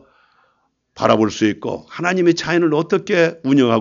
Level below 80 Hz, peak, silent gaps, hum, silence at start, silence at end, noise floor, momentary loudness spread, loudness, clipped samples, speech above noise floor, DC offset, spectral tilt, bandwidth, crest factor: -58 dBFS; 0 dBFS; none; none; 0.95 s; 0 s; -65 dBFS; 6 LU; -17 LUFS; under 0.1%; 49 dB; under 0.1%; -5.5 dB/octave; 7.4 kHz; 18 dB